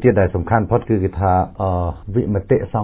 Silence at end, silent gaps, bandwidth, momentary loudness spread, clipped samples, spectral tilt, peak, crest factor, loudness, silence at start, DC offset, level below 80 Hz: 0 s; none; 4 kHz; 4 LU; under 0.1%; -13 dB/octave; -2 dBFS; 16 dB; -18 LUFS; 0 s; under 0.1%; -30 dBFS